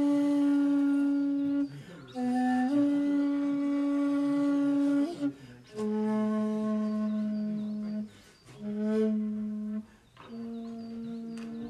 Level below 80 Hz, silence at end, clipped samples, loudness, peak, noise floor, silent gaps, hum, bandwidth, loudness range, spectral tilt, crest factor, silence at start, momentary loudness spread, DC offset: -70 dBFS; 0 s; under 0.1%; -30 LUFS; -18 dBFS; -53 dBFS; none; none; 10 kHz; 7 LU; -7.5 dB/octave; 12 dB; 0 s; 14 LU; under 0.1%